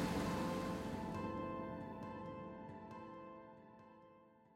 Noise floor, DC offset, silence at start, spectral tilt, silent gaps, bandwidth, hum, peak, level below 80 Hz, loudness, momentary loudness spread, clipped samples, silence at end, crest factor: -66 dBFS; under 0.1%; 0 s; -6 dB/octave; none; 16 kHz; none; -28 dBFS; -62 dBFS; -45 LUFS; 21 LU; under 0.1%; 0 s; 16 dB